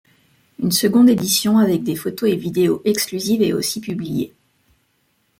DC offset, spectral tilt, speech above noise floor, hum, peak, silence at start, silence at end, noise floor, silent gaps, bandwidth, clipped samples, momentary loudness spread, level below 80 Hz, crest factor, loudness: under 0.1%; -4.5 dB/octave; 47 dB; none; -4 dBFS; 0.6 s; 1.1 s; -65 dBFS; none; 17 kHz; under 0.1%; 12 LU; -58 dBFS; 16 dB; -18 LUFS